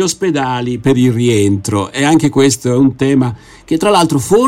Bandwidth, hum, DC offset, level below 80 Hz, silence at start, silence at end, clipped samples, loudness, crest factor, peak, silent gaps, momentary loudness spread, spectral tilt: 16 kHz; none; under 0.1%; -44 dBFS; 0 s; 0 s; under 0.1%; -13 LUFS; 12 dB; 0 dBFS; none; 6 LU; -5.5 dB/octave